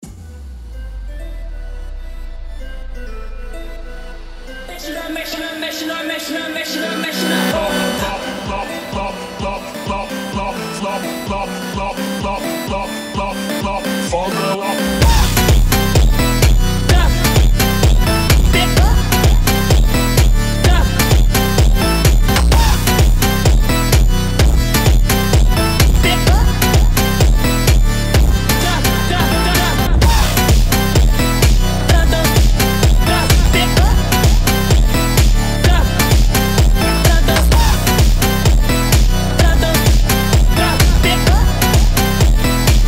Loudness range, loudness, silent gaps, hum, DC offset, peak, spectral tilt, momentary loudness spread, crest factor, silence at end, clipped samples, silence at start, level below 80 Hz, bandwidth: 10 LU; -14 LUFS; none; none; under 0.1%; 0 dBFS; -4.5 dB/octave; 18 LU; 12 dB; 0 s; under 0.1%; 0.05 s; -16 dBFS; 16.5 kHz